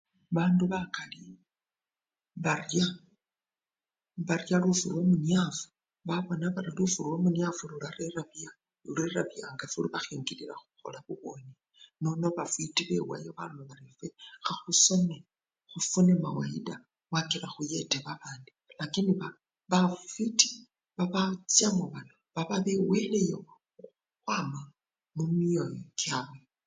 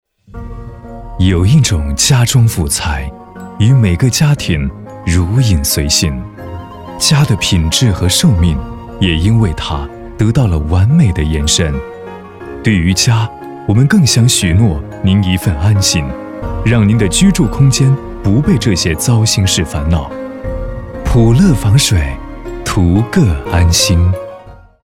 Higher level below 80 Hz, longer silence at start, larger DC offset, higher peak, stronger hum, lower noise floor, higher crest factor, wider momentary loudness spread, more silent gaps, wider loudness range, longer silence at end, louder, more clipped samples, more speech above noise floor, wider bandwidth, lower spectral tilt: second, -70 dBFS vs -24 dBFS; about the same, 0.3 s vs 0.35 s; neither; second, -6 dBFS vs 0 dBFS; neither; first, under -90 dBFS vs -35 dBFS; first, 26 dB vs 12 dB; first, 20 LU vs 17 LU; neither; first, 8 LU vs 2 LU; about the same, 0.3 s vs 0.35 s; second, -30 LUFS vs -12 LUFS; neither; first, over 60 dB vs 24 dB; second, 9.6 kHz vs 16.5 kHz; about the same, -4 dB/octave vs -5 dB/octave